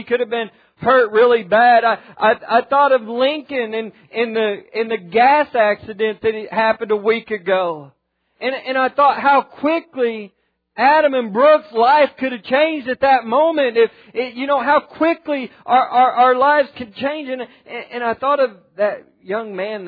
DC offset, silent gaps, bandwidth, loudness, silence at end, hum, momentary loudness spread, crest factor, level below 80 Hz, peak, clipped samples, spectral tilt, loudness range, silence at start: under 0.1%; none; 5 kHz; -17 LUFS; 0 s; none; 12 LU; 14 dB; -62 dBFS; -2 dBFS; under 0.1%; -7.5 dB/octave; 4 LU; 0 s